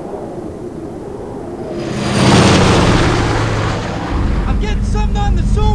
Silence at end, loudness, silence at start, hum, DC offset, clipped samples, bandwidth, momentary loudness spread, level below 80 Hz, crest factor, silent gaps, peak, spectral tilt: 0 s; -14 LUFS; 0 s; none; 0.4%; under 0.1%; 11 kHz; 17 LU; -20 dBFS; 12 dB; none; -2 dBFS; -5.5 dB/octave